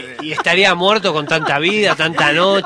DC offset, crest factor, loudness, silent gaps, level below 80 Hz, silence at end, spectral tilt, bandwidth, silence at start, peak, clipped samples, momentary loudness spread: under 0.1%; 14 dB; -14 LUFS; none; -56 dBFS; 0 s; -4 dB/octave; 11 kHz; 0 s; 0 dBFS; under 0.1%; 5 LU